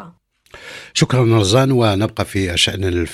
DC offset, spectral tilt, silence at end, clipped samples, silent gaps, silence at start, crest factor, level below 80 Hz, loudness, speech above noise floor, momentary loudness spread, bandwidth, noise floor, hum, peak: under 0.1%; -5 dB/octave; 0 s; under 0.1%; none; 0 s; 16 dB; -40 dBFS; -16 LUFS; 30 dB; 9 LU; 14.5 kHz; -45 dBFS; none; 0 dBFS